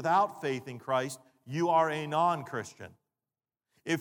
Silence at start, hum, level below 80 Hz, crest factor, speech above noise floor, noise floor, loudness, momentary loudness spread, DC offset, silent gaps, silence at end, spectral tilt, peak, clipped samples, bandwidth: 0 s; none; -82 dBFS; 18 dB; over 60 dB; under -90 dBFS; -31 LUFS; 18 LU; under 0.1%; none; 0 s; -5.5 dB/octave; -14 dBFS; under 0.1%; 19 kHz